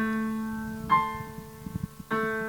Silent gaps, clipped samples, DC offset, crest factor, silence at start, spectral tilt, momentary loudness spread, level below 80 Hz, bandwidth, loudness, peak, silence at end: none; under 0.1%; under 0.1%; 20 dB; 0 s; -6 dB/octave; 14 LU; -52 dBFS; 19 kHz; -30 LUFS; -10 dBFS; 0 s